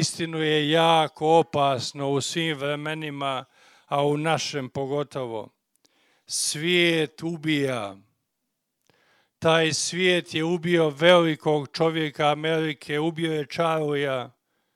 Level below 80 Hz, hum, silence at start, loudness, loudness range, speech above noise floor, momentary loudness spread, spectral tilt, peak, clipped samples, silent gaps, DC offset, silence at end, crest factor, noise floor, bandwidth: -70 dBFS; none; 0 s; -24 LUFS; 6 LU; 56 dB; 10 LU; -4 dB/octave; 0 dBFS; under 0.1%; none; under 0.1%; 0.45 s; 24 dB; -79 dBFS; 14.5 kHz